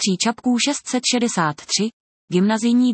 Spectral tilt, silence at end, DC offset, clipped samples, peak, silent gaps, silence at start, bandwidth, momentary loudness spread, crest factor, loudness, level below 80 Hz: -3.5 dB/octave; 0 s; under 0.1%; under 0.1%; -6 dBFS; 1.93-2.28 s; 0 s; 8.8 kHz; 4 LU; 14 dB; -20 LUFS; -68 dBFS